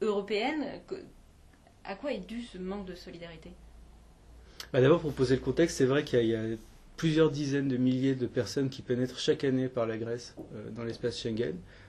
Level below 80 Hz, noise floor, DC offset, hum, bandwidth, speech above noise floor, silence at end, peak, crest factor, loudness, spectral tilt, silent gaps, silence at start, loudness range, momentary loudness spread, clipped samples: -56 dBFS; -58 dBFS; under 0.1%; none; 13.5 kHz; 27 dB; 0 s; -12 dBFS; 20 dB; -30 LUFS; -6 dB/octave; none; 0 s; 13 LU; 17 LU; under 0.1%